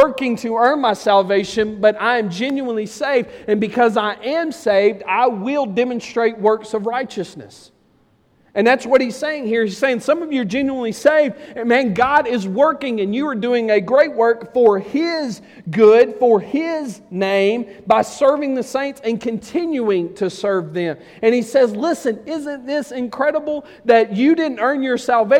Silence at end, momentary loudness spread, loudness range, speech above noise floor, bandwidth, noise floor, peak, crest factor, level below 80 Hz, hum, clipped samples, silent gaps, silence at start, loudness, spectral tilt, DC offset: 0 s; 9 LU; 4 LU; 40 dB; 14 kHz; -57 dBFS; -2 dBFS; 16 dB; -58 dBFS; none; under 0.1%; none; 0 s; -18 LUFS; -5.5 dB/octave; under 0.1%